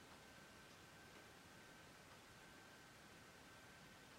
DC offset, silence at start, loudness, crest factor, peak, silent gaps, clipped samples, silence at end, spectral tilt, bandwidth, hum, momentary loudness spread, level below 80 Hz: under 0.1%; 0 s; -62 LUFS; 14 dB; -50 dBFS; none; under 0.1%; 0 s; -3 dB/octave; 16 kHz; none; 1 LU; -80 dBFS